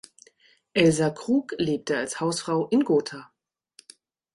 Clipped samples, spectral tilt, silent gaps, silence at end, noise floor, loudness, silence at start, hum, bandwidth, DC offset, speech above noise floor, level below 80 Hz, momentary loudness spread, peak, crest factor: under 0.1%; -5 dB/octave; none; 1.1 s; -60 dBFS; -24 LUFS; 0.75 s; none; 11.5 kHz; under 0.1%; 37 dB; -62 dBFS; 7 LU; -6 dBFS; 20 dB